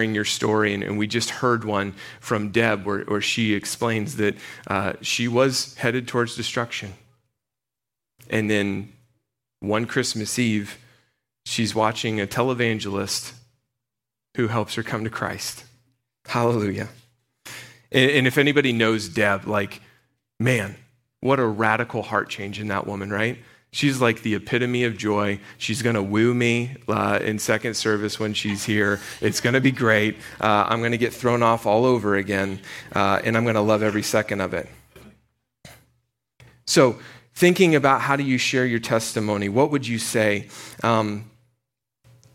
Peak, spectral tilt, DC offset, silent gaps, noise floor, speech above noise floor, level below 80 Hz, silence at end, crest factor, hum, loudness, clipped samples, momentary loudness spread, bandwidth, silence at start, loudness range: -4 dBFS; -4.5 dB/octave; under 0.1%; none; -88 dBFS; 66 dB; -60 dBFS; 1.05 s; 20 dB; none; -22 LUFS; under 0.1%; 10 LU; 16.5 kHz; 0 s; 6 LU